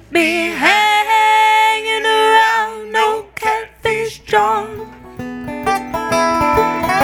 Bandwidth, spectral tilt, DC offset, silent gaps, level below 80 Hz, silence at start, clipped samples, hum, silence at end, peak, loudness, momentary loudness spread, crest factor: 18.5 kHz; -3 dB/octave; under 0.1%; none; -42 dBFS; 0.1 s; under 0.1%; none; 0 s; 0 dBFS; -14 LUFS; 13 LU; 16 dB